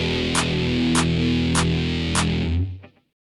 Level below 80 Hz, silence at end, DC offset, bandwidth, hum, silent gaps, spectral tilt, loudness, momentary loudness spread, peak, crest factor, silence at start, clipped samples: -34 dBFS; 0.4 s; under 0.1%; 12 kHz; none; none; -4.5 dB/octave; -21 LUFS; 6 LU; -6 dBFS; 16 dB; 0 s; under 0.1%